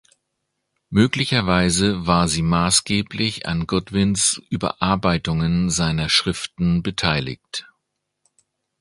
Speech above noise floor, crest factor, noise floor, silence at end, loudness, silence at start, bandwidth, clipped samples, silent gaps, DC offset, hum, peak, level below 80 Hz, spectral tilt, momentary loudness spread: 57 dB; 20 dB; -77 dBFS; 1.2 s; -20 LUFS; 0.9 s; 11.5 kHz; under 0.1%; none; under 0.1%; none; 0 dBFS; -40 dBFS; -4 dB/octave; 7 LU